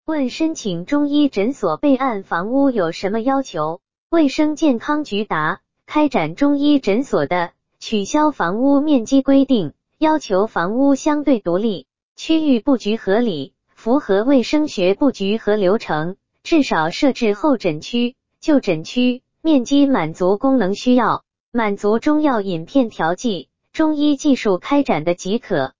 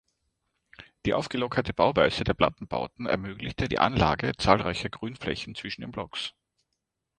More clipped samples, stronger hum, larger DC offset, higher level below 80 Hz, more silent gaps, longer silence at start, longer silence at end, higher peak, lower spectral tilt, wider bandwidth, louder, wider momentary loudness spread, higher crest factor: neither; neither; first, 2% vs under 0.1%; second, -52 dBFS vs -46 dBFS; first, 3.98-4.10 s, 12.03-12.16 s, 21.40-21.52 s vs none; second, 0 s vs 0.8 s; second, 0 s vs 0.9 s; about the same, -4 dBFS vs -4 dBFS; about the same, -5.5 dB/octave vs -5.5 dB/octave; second, 7.6 kHz vs 10 kHz; first, -18 LUFS vs -28 LUFS; second, 8 LU vs 12 LU; second, 14 dB vs 24 dB